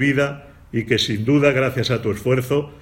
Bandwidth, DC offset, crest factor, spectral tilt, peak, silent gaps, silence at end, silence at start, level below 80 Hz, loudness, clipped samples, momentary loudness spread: 16.5 kHz; under 0.1%; 18 dB; -6 dB/octave; -2 dBFS; none; 0.05 s; 0 s; -48 dBFS; -20 LUFS; under 0.1%; 10 LU